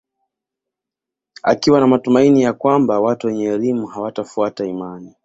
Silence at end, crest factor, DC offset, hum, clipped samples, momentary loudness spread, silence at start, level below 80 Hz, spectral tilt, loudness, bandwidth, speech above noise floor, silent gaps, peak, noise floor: 0.15 s; 16 dB; under 0.1%; none; under 0.1%; 12 LU; 1.45 s; -58 dBFS; -6.5 dB/octave; -16 LUFS; 7.8 kHz; 69 dB; none; -2 dBFS; -85 dBFS